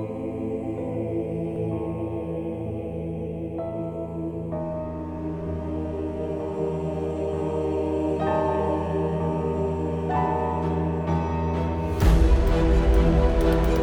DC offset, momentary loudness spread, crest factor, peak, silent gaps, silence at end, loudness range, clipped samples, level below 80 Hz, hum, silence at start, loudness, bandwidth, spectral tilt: under 0.1%; 10 LU; 18 dB; -6 dBFS; none; 0 s; 8 LU; under 0.1%; -28 dBFS; none; 0 s; -26 LUFS; 13 kHz; -8.5 dB/octave